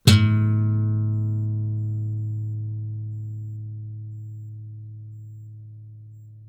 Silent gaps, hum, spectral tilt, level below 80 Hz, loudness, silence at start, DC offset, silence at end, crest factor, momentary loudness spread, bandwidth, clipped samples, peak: none; none; -6 dB/octave; -54 dBFS; -25 LUFS; 0.05 s; under 0.1%; 0 s; 18 dB; 21 LU; 14.5 kHz; under 0.1%; -6 dBFS